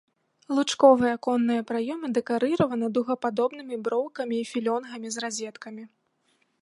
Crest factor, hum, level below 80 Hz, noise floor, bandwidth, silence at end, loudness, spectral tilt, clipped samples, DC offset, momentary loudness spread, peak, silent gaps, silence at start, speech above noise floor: 22 dB; none; -70 dBFS; -70 dBFS; 11.5 kHz; 0.75 s; -26 LUFS; -4.5 dB/octave; under 0.1%; under 0.1%; 14 LU; -4 dBFS; none; 0.5 s; 45 dB